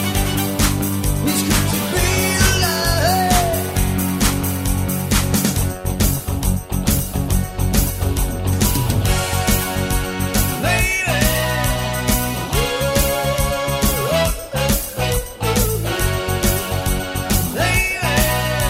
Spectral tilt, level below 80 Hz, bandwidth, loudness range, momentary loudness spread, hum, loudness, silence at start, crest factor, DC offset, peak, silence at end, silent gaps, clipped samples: -4 dB/octave; -26 dBFS; 16.5 kHz; 3 LU; 5 LU; none; -18 LUFS; 0 s; 18 dB; under 0.1%; 0 dBFS; 0 s; none; under 0.1%